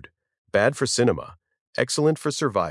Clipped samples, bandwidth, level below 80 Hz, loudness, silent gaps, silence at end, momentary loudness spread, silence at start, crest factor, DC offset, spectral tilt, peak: under 0.1%; 12 kHz; -60 dBFS; -23 LUFS; 1.61-1.73 s; 0 s; 10 LU; 0.55 s; 20 dB; under 0.1%; -4.5 dB/octave; -4 dBFS